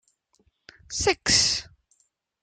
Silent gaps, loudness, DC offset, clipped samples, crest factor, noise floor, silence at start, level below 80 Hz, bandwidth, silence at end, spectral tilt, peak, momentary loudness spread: none; -22 LUFS; under 0.1%; under 0.1%; 22 dB; -70 dBFS; 0.9 s; -50 dBFS; 11.5 kHz; 0.8 s; -1 dB/octave; -6 dBFS; 11 LU